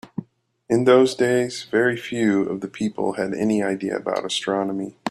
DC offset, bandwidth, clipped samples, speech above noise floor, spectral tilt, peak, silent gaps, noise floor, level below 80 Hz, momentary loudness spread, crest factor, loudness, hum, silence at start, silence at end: under 0.1%; 12.5 kHz; under 0.1%; 30 dB; -5 dB/octave; -2 dBFS; none; -51 dBFS; -64 dBFS; 11 LU; 18 dB; -21 LUFS; none; 0.05 s; 0 s